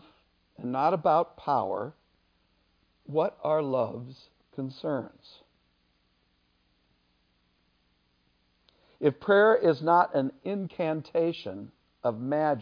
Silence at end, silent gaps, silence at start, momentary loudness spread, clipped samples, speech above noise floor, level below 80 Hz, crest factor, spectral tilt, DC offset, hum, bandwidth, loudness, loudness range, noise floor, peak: 0 s; none; 0.6 s; 18 LU; under 0.1%; 44 dB; -72 dBFS; 20 dB; -8.5 dB/octave; under 0.1%; none; 5.2 kHz; -27 LUFS; 15 LU; -71 dBFS; -10 dBFS